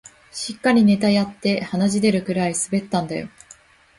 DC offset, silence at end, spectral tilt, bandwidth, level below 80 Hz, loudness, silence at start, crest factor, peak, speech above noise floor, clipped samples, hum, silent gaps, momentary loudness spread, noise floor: under 0.1%; 0.7 s; -5 dB/octave; 11.5 kHz; -56 dBFS; -20 LUFS; 0.35 s; 16 dB; -6 dBFS; 30 dB; under 0.1%; none; none; 14 LU; -50 dBFS